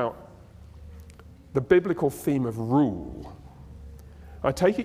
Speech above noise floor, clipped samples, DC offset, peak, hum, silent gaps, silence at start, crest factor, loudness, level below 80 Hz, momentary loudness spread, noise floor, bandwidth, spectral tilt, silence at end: 24 dB; under 0.1%; under 0.1%; -6 dBFS; none; none; 0 s; 22 dB; -25 LUFS; -48 dBFS; 25 LU; -48 dBFS; 16 kHz; -7 dB/octave; 0 s